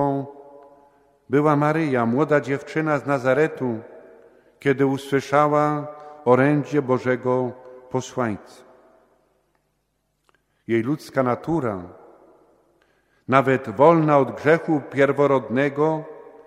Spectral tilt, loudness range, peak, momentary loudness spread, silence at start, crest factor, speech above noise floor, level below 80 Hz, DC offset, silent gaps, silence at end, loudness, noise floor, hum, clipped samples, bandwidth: -7.5 dB/octave; 9 LU; 0 dBFS; 12 LU; 0 s; 22 dB; 51 dB; -64 dBFS; under 0.1%; none; 0.25 s; -21 LUFS; -71 dBFS; none; under 0.1%; 13.5 kHz